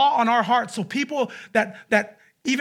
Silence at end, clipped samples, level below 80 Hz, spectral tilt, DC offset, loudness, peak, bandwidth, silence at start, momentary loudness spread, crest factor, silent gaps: 0 s; under 0.1%; -74 dBFS; -4 dB/octave; under 0.1%; -23 LUFS; -6 dBFS; 15.5 kHz; 0 s; 8 LU; 18 dB; none